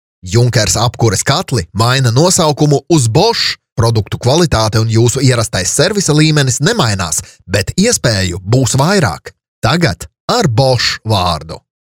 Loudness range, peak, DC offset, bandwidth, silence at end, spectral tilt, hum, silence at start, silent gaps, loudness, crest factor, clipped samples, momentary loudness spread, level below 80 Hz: 2 LU; 0 dBFS; 0.3%; 16.5 kHz; 0.25 s; -4.5 dB/octave; none; 0.25 s; 3.72-3.76 s, 9.48-9.62 s, 10.20-10.28 s; -12 LUFS; 12 dB; under 0.1%; 6 LU; -36 dBFS